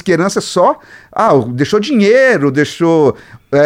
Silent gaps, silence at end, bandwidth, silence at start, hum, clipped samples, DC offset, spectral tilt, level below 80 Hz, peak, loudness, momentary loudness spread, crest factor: none; 0 s; 15.5 kHz; 0.05 s; none; under 0.1%; under 0.1%; -5.5 dB/octave; -52 dBFS; 0 dBFS; -12 LUFS; 8 LU; 12 dB